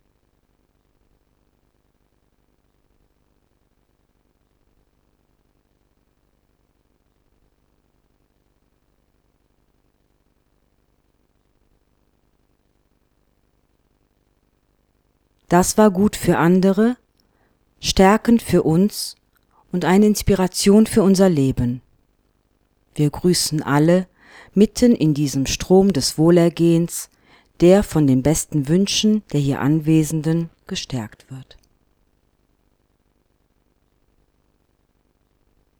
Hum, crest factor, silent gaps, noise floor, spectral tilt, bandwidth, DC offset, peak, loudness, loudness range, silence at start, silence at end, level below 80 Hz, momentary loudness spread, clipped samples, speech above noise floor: 50 Hz at -45 dBFS; 20 dB; none; -64 dBFS; -5.5 dB/octave; 19.5 kHz; under 0.1%; -2 dBFS; -17 LUFS; 6 LU; 15.5 s; 4.35 s; -44 dBFS; 14 LU; under 0.1%; 48 dB